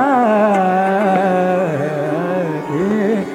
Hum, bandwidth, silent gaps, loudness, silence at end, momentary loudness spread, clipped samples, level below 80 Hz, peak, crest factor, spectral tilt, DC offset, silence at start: none; 13.5 kHz; none; -16 LUFS; 0 s; 6 LU; under 0.1%; -60 dBFS; -2 dBFS; 12 dB; -7.5 dB/octave; under 0.1%; 0 s